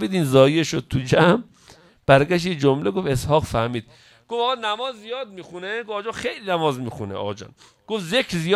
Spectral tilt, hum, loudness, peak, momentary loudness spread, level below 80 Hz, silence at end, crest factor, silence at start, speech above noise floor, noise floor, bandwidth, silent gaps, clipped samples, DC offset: -5.5 dB/octave; none; -21 LUFS; 0 dBFS; 15 LU; -48 dBFS; 0 s; 22 dB; 0 s; 30 dB; -51 dBFS; 14.5 kHz; none; under 0.1%; under 0.1%